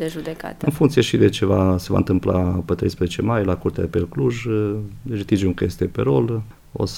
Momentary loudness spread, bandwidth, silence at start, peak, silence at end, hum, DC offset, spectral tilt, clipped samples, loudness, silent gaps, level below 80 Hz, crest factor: 11 LU; 16.5 kHz; 0 s; -2 dBFS; 0 s; none; under 0.1%; -7 dB/octave; under 0.1%; -21 LUFS; none; -40 dBFS; 18 dB